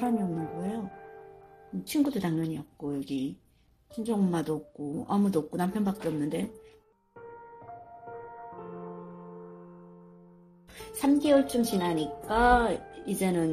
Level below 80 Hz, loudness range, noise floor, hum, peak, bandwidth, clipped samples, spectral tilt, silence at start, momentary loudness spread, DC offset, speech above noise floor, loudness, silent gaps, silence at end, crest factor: -50 dBFS; 18 LU; -60 dBFS; none; -10 dBFS; 15.5 kHz; under 0.1%; -6 dB/octave; 0 s; 24 LU; under 0.1%; 32 dB; -29 LUFS; none; 0 s; 22 dB